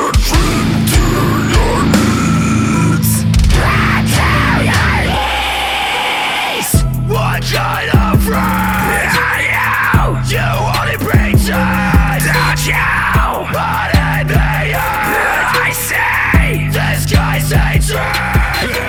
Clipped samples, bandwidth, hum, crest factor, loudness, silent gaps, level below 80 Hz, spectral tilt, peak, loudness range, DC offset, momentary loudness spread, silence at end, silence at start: under 0.1%; over 20 kHz; none; 12 dB; -12 LUFS; none; -20 dBFS; -4.5 dB/octave; 0 dBFS; 2 LU; under 0.1%; 3 LU; 0 s; 0 s